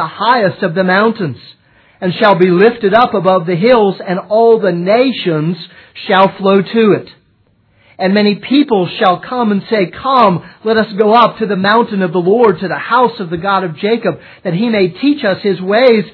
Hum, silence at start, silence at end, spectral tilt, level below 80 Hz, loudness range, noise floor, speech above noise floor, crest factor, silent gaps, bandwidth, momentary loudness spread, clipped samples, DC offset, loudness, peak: none; 0 s; 0.05 s; -9 dB/octave; -54 dBFS; 3 LU; -54 dBFS; 42 dB; 12 dB; none; 5.4 kHz; 9 LU; 0.2%; under 0.1%; -12 LUFS; 0 dBFS